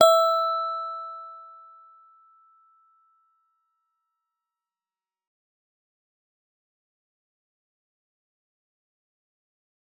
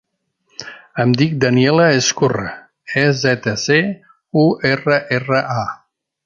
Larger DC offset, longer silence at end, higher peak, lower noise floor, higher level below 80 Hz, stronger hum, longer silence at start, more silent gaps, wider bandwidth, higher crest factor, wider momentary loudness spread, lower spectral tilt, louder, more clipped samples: neither; first, 8.55 s vs 0.5 s; about the same, -4 dBFS vs -2 dBFS; first, under -90 dBFS vs -66 dBFS; second, under -90 dBFS vs -54 dBFS; neither; second, 0 s vs 0.6 s; neither; first, over 20 kHz vs 7.4 kHz; first, 26 dB vs 16 dB; first, 27 LU vs 20 LU; second, -0.5 dB/octave vs -5 dB/octave; second, -24 LUFS vs -16 LUFS; neither